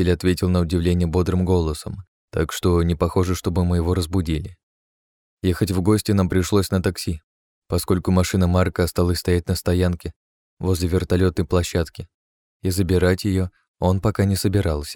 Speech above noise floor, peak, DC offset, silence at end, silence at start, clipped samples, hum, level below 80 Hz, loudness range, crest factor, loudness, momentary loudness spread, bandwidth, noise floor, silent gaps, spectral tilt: over 70 dB; -6 dBFS; under 0.1%; 0 s; 0 s; under 0.1%; none; -36 dBFS; 2 LU; 16 dB; -21 LUFS; 10 LU; 18 kHz; under -90 dBFS; 2.08-2.28 s, 4.63-5.37 s, 7.24-7.62 s, 10.16-10.57 s, 12.14-12.60 s, 13.68-13.74 s; -6.5 dB/octave